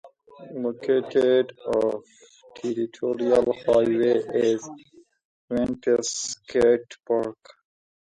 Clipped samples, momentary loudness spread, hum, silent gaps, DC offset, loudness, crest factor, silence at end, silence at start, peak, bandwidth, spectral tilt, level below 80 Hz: under 0.1%; 10 LU; none; 5.25-5.48 s; under 0.1%; -24 LUFS; 16 dB; 0.65 s; 0.05 s; -8 dBFS; 11 kHz; -4.5 dB/octave; -58 dBFS